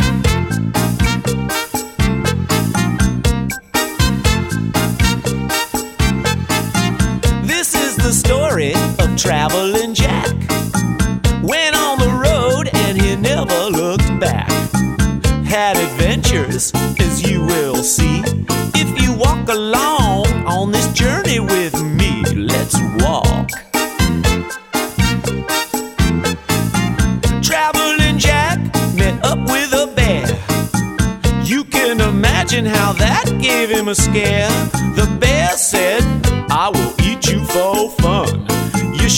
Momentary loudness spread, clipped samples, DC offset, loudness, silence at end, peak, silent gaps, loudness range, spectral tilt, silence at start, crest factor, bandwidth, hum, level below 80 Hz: 5 LU; under 0.1%; under 0.1%; -15 LUFS; 0 s; 0 dBFS; none; 3 LU; -4.5 dB/octave; 0 s; 14 dB; 17.5 kHz; none; -24 dBFS